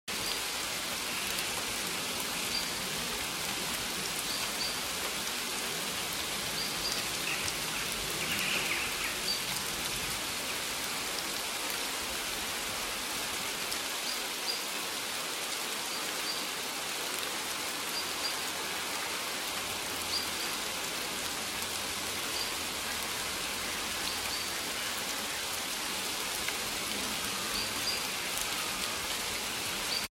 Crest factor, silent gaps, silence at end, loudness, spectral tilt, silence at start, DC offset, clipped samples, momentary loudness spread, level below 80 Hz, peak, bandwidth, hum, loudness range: 22 dB; none; 0 s; -32 LUFS; -0.5 dB/octave; 0.05 s; under 0.1%; under 0.1%; 2 LU; -58 dBFS; -12 dBFS; 17 kHz; none; 2 LU